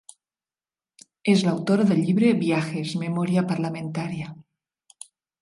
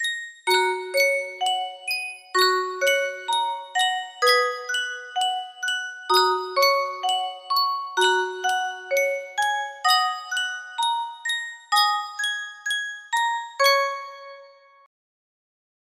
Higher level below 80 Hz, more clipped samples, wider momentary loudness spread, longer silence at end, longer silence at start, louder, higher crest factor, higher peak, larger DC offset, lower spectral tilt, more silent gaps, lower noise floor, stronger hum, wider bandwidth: first, -68 dBFS vs -78 dBFS; neither; first, 16 LU vs 8 LU; second, 1 s vs 1.4 s; first, 1.25 s vs 0 s; about the same, -23 LUFS vs -23 LUFS; about the same, 18 dB vs 20 dB; about the same, -6 dBFS vs -4 dBFS; neither; first, -6.5 dB/octave vs 1 dB/octave; neither; first, under -90 dBFS vs -49 dBFS; neither; second, 11.5 kHz vs 16 kHz